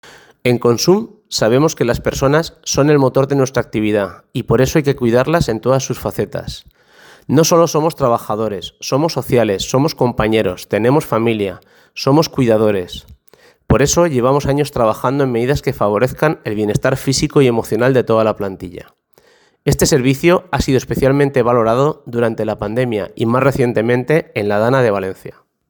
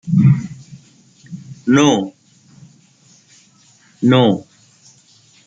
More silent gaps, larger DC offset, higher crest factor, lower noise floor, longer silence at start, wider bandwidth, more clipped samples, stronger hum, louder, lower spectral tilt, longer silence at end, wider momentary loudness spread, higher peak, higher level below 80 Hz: neither; neither; about the same, 16 dB vs 18 dB; about the same, -52 dBFS vs -51 dBFS; first, 0.45 s vs 0.05 s; first, over 20 kHz vs 7.8 kHz; neither; neither; about the same, -15 LUFS vs -15 LUFS; about the same, -5.5 dB/octave vs -6.5 dB/octave; second, 0.4 s vs 1.05 s; second, 8 LU vs 23 LU; about the same, 0 dBFS vs -2 dBFS; first, -38 dBFS vs -58 dBFS